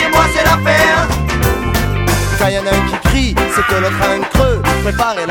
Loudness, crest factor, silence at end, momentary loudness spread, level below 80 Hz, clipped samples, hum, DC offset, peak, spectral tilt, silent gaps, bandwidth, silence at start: -13 LUFS; 12 dB; 0 s; 5 LU; -22 dBFS; under 0.1%; none; under 0.1%; 0 dBFS; -4.5 dB/octave; none; 19 kHz; 0 s